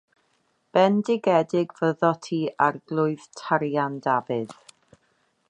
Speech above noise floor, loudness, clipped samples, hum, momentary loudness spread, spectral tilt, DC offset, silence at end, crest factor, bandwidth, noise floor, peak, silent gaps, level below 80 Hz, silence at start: 46 dB; -24 LUFS; under 0.1%; none; 8 LU; -6.5 dB/octave; under 0.1%; 1 s; 20 dB; 10.5 kHz; -69 dBFS; -6 dBFS; none; -74 dBFS; 0.75 s